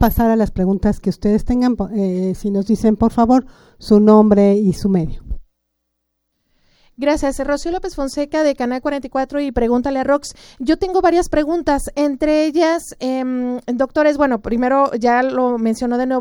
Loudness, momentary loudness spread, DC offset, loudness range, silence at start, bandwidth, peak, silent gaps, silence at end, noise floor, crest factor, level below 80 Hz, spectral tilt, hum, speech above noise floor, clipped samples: -17 LUFS; 8 LU; under 0.1%; 7 LU; 0 s; 16.5 kHz; 0 dBFS; none; 0 s; -73 dBFS; 16 dB; -34 dBFS; -6.5 dB/octave; none; 57 dB; under 0.1%